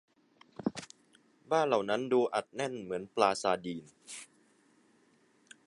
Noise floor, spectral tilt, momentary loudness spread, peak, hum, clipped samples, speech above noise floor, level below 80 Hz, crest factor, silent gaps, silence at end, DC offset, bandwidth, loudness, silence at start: -68 dBFS; -4.5 dB/octave; 18 LU; -10 dBFS; none; under 0.1%; 36 dB; -76 dBFS; 24 dB; none; 1.4 s; under 0.1%; 11.5 kHz; -32 LUFS; 0.6 s